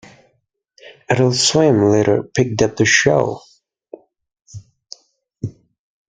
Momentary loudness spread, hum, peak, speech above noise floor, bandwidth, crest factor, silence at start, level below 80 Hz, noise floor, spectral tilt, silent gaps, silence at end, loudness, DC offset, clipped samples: 18 LU; none; 0 dBFS; 52 dB; 9.6 kHz; 18 dB; 0.85 s; -52 dBFS; -67 dBFS; -4 dB/octave; 4.42-4.46 s; 0.6 s; -15 LUFS; under 0.1%; under 0.1%